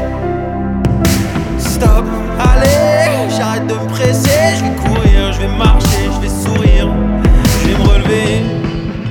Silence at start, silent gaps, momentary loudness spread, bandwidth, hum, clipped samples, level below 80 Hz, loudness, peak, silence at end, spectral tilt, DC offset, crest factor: 0 s; none; 7 LU; 19 kHz; none; under 0.1%; -14 dBFS; -13 LUFS; 0 dBFS; 0 s; -5.5 dB/octave; under 0.1%; 10 dB